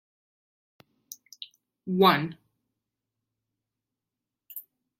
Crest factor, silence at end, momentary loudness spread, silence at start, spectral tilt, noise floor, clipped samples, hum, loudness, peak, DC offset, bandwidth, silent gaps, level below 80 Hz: 26 dB; 0.4 s; 25 LU; 1.4 s; -5.5 dB/octave; -88 dBFS; under 0.1%; none; -24 LUFS; -6 dBFS; under 0.1%; 16.5 kHz; none; -76 dBFS